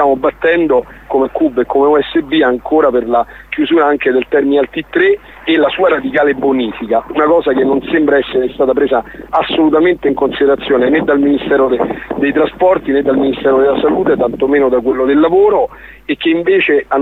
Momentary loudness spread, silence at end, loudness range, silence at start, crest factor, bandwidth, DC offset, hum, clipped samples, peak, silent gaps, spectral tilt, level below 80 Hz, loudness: 6 LU; 0 s; 1 LU; 0 s; 10 dB; 4.2 kHz; under 0.1%; none; under 0.1%; 0 dBFS; none; -7.5 dB/octave; -42 dBFS; -12 LUFS